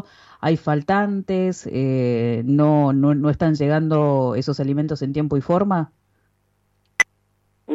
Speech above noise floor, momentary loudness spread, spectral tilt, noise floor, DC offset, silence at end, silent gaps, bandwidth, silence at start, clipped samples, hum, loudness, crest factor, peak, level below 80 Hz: 47 dB; 7 LU; -7.5 dB/octave; -66 dBFS; under 0.1%; 0 s; none; 10.5 kHz; 0.4 s; under 0.1%; 50 Hz at -40 dBFS; -20 LUFS; 14 dB; -6 dBFS; -52 dBFS